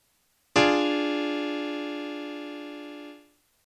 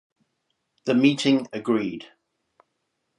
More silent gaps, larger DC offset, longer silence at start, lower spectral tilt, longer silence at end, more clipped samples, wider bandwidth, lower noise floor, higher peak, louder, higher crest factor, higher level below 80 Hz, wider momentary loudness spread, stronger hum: neither; neither; second, 0.55 s vs 0.85 s; second, -4 dB/octave vs -5.5 dB/octave; second, 0.5 s vs 1.15 s; neither; about the same, 10.5 kHz vs 11 kHz; second, -69 dBFS vs -77 dBFS; about the same, -8 dBFS vs -6 dBFS; second, -27 LUFS vs -23 LUFS; about the same, 22 dB vs 20 dB; first, -64 dBFS vs -72 dBFS; first, 19 LU vs 14 LU; neither